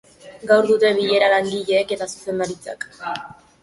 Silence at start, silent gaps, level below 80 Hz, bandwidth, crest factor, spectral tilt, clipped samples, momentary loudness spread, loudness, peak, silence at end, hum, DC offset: 0.25 s; none; -60 dBFS; 11.5 kHz; 18 dB; -4 dB/octave; under 0.1%; 15 LU; -19 LUFS; -2 dBFS; 0.3 s; none; under 0.1%